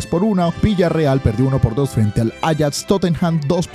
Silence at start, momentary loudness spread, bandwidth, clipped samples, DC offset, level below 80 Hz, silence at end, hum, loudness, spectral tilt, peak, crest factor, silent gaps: 0 s; 3 LU; 14.5 kHz; under 0.1%; under 0.1%; -34 dBFS; 0 s; none; -17 LUFS; -6.5 dB/octave; -2 dBFS; 16 dB; none